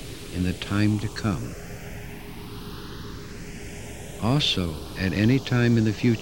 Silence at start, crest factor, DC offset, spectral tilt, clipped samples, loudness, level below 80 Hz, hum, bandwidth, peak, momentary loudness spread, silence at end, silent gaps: 0 s; 16 dB; 0.6%; -6 dB/octave; under 0.1%; -24 LUFS; -42 dBFS; none; 17.5 kHz; -10 dBFS; 17 LU; 0 s; none